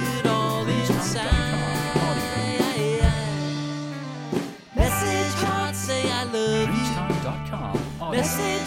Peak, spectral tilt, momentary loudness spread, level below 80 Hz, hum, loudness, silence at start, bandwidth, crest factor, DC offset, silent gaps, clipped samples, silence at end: -6 dBFS; -5 dB/octave; 7 LU; -34 dBFS; none; -25 LUFS; 0 s; 17 kHz; 18 dB; under 0.1%; none; under 0.1%; 0 s